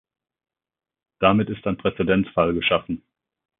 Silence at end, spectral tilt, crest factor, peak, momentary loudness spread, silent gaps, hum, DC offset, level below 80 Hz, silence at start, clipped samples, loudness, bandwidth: 0.65 s; -11 dB/octave; 20 dB; -4 dBFS; 7 LU; none; none; under 0.1%; -48 dBFS; 1.2 s; under 0.1%; -21 LUFS; 3.9 kHz